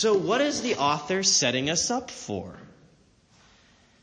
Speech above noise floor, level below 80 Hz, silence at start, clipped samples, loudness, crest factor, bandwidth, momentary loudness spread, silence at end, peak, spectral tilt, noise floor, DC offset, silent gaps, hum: 35 dB; -62 dBFS; 0 s; under 0.1%; -24 LUFS; 20 dB; 10.5 kHz; 14 LU; 1.35 s; -8 dBFS; -2.5 dB/octave; -60 dBFS; under 0.1%; none; none